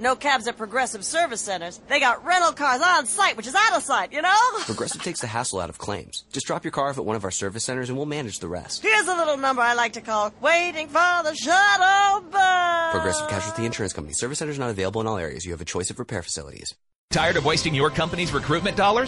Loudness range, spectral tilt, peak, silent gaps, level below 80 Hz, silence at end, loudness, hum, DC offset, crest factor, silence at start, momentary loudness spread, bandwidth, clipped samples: 8 LU; -3 dB/octave; -6 dBFS; 16.95-17.08 s; -50 dBFS; 0 s; -22 LUFS; none; under 0.1%; 16 dB; 0 s; 11 LU; 11.5 kHz; under 0.1%